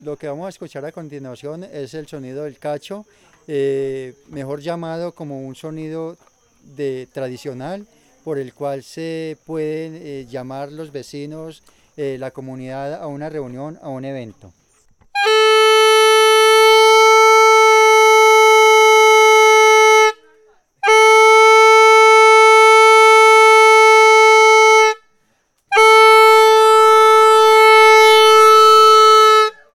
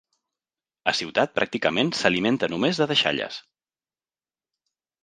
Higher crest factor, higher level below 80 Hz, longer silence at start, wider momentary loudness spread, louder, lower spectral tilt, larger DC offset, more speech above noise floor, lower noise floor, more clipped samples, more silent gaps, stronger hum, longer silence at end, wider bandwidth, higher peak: second, 10 dB vs 24 dB; about the same, -62 dBFS vs -64 dBFS; second, 0.05 s vs 0.85 s; first, 23 LU vs 8 LU; first, -9 LUFS vs -23 LUFS; second, -1.5 dB/octave vs -4 dB/octave; neither; second, 36 dB vs over 67 dB; second, -63 dBFS vs under -90 dBFS; neither; neither; neither; second, 0.3 s vs 1.65 s; first, 17 kHz vs 9.8 kHz; about the same, -2 dBFS vs -2 dBFS